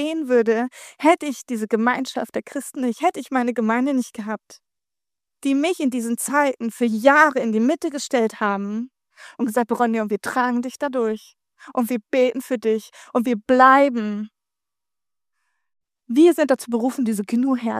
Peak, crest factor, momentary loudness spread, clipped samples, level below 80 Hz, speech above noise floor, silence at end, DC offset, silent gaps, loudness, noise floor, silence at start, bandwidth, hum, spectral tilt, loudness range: 0 dBFS; 20 dB; 13 LU; under 0.1%; -72 dBFS; 69 dB; 0 s; under 0.1%; none; -20 LUFS; -89 dBFS; 0 s; 15.5 kHz; none; -4.5 dB/octave; 4 LU